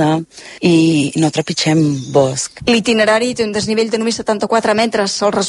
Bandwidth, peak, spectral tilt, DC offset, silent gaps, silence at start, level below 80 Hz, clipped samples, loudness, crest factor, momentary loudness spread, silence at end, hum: 11.5 kHz; -2 dBFS; -4.5 dB/octave; under 0.1%; none; 0 s; -50 dBFS; under 0.1%; -15 LUFS; 14 dB; 6 LU; 0 s; none